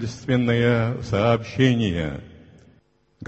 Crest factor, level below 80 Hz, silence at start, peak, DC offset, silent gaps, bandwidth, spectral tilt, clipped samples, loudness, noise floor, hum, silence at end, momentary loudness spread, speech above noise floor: 18 dB; -44 dBFS; 0 s; -4 dBFS; under 0.1%; none; 8.2 kHz; -7 dB/octave; under 0.1%; -21 LUFS; -60 dBFS; none; 0 s; 8 LU; 39 dB